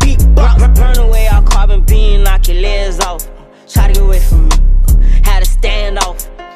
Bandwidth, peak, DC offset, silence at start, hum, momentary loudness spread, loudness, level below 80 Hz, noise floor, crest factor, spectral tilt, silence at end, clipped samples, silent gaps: 15 kHz; 0 dBFS; under 0.1%; 0 s; none; 8 LU; -12 LUFS; -8 dBFS; -31 dBFS; 6 dB; -5 dB/octave; 0.05 s; under 0.1%; none